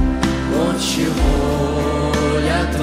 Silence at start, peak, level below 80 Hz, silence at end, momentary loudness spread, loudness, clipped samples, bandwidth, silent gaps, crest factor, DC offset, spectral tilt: 0 s; -2 dBFS; -24 dBFS; 0 s; 1 LU; -18 LUFS; under 0.1%; 16 kHz; none; 14 dB; under 0.1%; -5.5 dB/octave